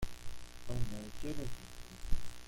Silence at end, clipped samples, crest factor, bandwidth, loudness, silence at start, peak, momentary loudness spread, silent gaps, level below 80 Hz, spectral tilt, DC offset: 0 s; under 0.1%; 20 dB; 15.5 kHz; -46 LUFS; 0 s; -16 dBFS; 10 LU; none; -44 dBFS; -5 dB/octave; under 0.1%